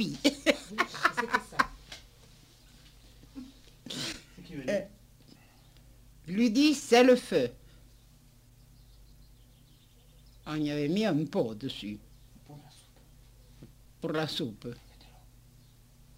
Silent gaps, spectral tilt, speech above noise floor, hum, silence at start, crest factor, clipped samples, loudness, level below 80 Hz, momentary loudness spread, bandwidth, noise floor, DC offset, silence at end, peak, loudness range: none; -4.5 dB/octave; 31 dB; 50 Hz at -60 dBFS; 0 s; 24 dB; under 0.1%; -29 LUFS; -58 dBFS; 25 LU; 16 kHz; -58 dBFS; under 0.1%; 1.45 s; -8 dBFS; 12 LU